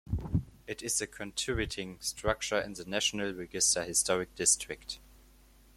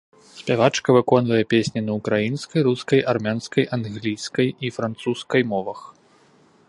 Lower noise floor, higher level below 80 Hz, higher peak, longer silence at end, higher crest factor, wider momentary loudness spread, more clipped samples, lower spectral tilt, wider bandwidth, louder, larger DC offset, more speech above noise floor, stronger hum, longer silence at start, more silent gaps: first, -59 dBFS vs -55 dBFS; first, -50 dBFS vs -60 dBFS; second, -12 dBFS vs 0 dBFS; about the same, 0.75 s vs 0.8 s; about the same, 22 dB vs 20 dB; first, 13 LU vs 9 LU; neither; second, -2.5 dB/octave vs -6 dB/octave; first, 16.5 kHz vs 11.5 kHz; second, -31 LUFS vs -21 LUFS; neither; second, 26 dB vs 35 dB; neither; second, 0.05 s vs 0.35 s; neither